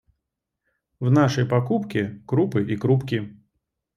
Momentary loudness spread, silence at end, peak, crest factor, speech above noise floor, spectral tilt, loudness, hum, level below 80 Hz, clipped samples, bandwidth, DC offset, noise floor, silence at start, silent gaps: 9 LU; 0.65 s; -6 dBFS; 18 dB; 60 dB; -7.5 dB/octave; -23 LUFS; none; -60 dBFS; under 0.1%; 7.2 kHz; under 0.1%; -82 dBFS; 1 s; none